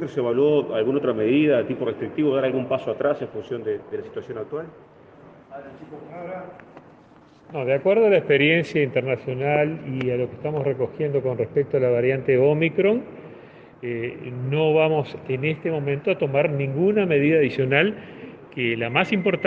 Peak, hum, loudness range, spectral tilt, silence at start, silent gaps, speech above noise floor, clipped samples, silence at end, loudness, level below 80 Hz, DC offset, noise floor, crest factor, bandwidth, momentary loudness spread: -4 dBFS; none; 11 LU; -8.5 dB/octave; 0 s; none; 29 dB; under 0.1%; 0 s; -22 LUFS; -64 dBFS; under 0.1%; -51 dBFS; 18 dB; 7 kHz; 17 LU